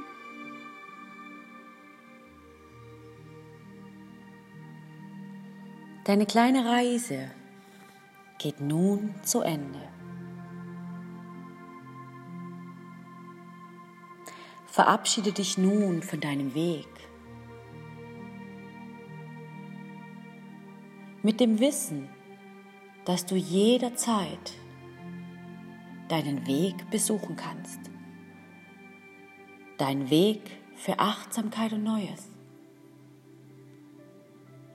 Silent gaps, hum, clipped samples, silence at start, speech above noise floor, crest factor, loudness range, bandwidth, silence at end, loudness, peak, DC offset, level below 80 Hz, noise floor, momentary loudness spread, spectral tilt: none; none; under 0.1%; 0 s; 27 dB; 26 dB; 18 LU; 16 kHz; 0 s; -28 LUFS; -6 dBFS; under 0.1%; -74 dBFS; -54 dBFS; 25 LU; -4.5 dB/octave